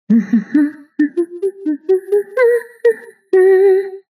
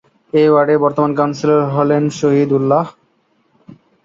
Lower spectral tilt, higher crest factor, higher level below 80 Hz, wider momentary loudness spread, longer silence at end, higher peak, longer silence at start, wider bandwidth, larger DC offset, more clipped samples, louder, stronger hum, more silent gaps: about the same, -8 dB/octave vs -7.5 dB/octave; about the same, 12 dB vs 14 dB; second, -78 dBFS vs -60 dBFS; first, 10 LU vs 5 LU; second, 0.15 s vs 1.15 s; about the same, -4 dBFS vs -2 dBFS; second, 0.1 s vs 0.35 s; first, 12 kHz vs 7.6 kHz; neither; neither; about the same, -15 LUFS vs -14 LUFS; neither; neither